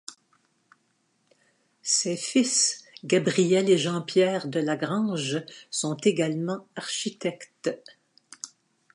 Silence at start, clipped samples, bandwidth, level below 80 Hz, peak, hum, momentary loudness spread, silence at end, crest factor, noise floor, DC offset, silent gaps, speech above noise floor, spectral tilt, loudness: 0.1 s; under 0.1%; 11.5 kHz; -78 dBFS; -8 dBFS; none; 15 LU; 0.45 s; 18 dB; -71 dBFS; under 0.1%; none; 45 dB; -3.5 dB/octave; -25 LUFS